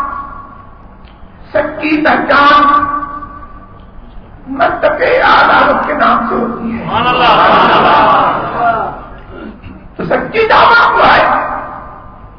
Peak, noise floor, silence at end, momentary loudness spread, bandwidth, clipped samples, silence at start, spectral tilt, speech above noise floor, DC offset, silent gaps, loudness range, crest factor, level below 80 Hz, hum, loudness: 0 dBFS; -34 dBFS; 0.05 s; 22 LU; 6.4 kHz; under 0.1%; 0 s; -6.5 dB/octave; 26 dB; 0.1%; none; 3 LU; 12 dB; -34 dBFS; none; -9 LUFS